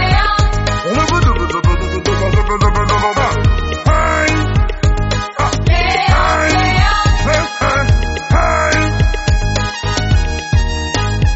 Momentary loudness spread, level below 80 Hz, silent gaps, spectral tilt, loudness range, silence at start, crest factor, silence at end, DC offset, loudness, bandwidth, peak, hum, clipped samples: 5 LU; -18 dBFS; none; -5 dB/octave; 2 LU; 0 s; 12 dB; 0 s; under 0.1%; -14 LUFS; 8.2 kHz; 0 dBFS; none; under 0.1%